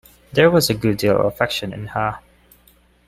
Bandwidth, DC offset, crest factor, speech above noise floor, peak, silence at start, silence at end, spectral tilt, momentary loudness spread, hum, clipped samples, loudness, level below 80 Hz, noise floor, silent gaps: 16 kHz; under 0.1%; 18 dB; 37 dB; -2 dBFS; 0.35 s; 0.9 s; -5 dB/octave; 11 LU; 60 Hz at -45 dBFS; under 0.1%; -19 LUFS; -48 dBFS; -54 dBFS; none